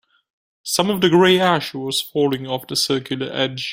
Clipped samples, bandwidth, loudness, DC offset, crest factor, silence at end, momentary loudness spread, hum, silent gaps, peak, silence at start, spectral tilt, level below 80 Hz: under 0.1%; 16.5 kHz; -18 LUFS; under 0.1%; 18 dB; 0 s; 9 LU; none; none; -2 dBFS; 0.65 s; -4 dB/octave; -60 dBFS